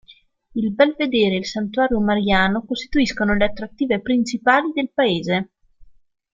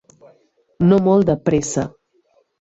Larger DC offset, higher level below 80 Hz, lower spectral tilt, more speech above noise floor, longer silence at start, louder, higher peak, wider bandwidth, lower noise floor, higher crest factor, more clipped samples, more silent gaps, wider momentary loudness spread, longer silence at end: neither; first, -42 dBFS vs -48 dBFS; second, -5.5 dB/octave vs -7 dB/octave; second, 33 dB vs 45 dB; second, 0.1 s vs 0.8 s; second, -20 LUFS vs -17 LUFS; about the same, -2 dBFS vs -4 dBFS; about the same, 7.6 kHz vs 8.2 kHz; second, -52 dBFS vs -61 dBFS; about the same, 18 dB vs 16 dB; neither; neither; about the same, 8 LU vs 10 LU; second, 0.5 s vs 0.9 s